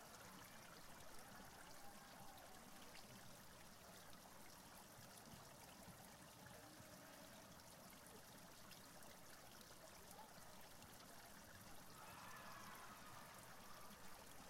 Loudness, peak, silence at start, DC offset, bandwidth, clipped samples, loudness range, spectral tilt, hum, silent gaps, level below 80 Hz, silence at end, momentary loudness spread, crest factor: -60 LUFS; -44 dBFS; 0 s; under 0.1%; 16 kHz; under 0.1%; 2 LU; -3 dB/octave; none; none; -76 dBFS; 0 s; 3 LU; 16 dB